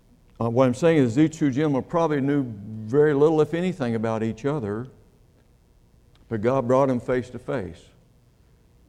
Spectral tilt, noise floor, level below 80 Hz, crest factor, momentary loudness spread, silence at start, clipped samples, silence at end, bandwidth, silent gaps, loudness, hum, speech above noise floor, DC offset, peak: -7.5 dB/octave; -57 dBFS; -54 dBFS; 18 dB; 12 LU; 0.4 s; under 0.1%; 1.15 s; 11 kHz; none; -23 LUFS; none; 35 dB; under 0.1%; -6 dBFS